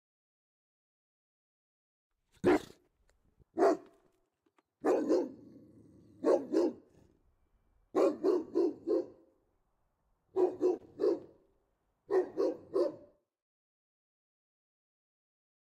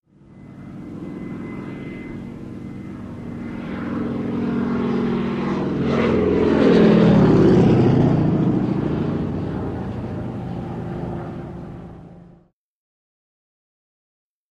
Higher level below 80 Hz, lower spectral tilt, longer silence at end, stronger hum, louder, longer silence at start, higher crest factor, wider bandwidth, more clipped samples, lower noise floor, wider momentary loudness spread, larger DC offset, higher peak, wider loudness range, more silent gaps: second, -74 dBFS vs -42 dBFS; second, -6.5 dB/octave vs -9 dB/octave; first, 2.75 s vs 2.25 s; neither; second, -33 LUFS vs -19 LUFS; first, 2.45 s vs 0.35 s; about the same, 20 dB vs 18 dB; first, 9.8 kHz vs 8.4 kHz; neither; first, -78 dBFS vs -54 dBFS; second, 7 LU vs 20 LU; neither; second, -16 dBFS vs -4 dBFS; second, 5 LU vs 18 LU; neither